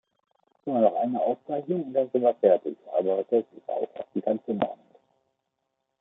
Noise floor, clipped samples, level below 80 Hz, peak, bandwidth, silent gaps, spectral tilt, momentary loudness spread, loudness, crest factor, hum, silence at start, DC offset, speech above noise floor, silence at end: -80 dBFS; under 0.1%; -80 dBFS; -6 dBFS; 3.9 kHz; none; -10.5 dB/octave; 10 LU; -27 LUFS; 22 dB; none; 0.65 s; under 0.1%; 54 dB; 1.25 s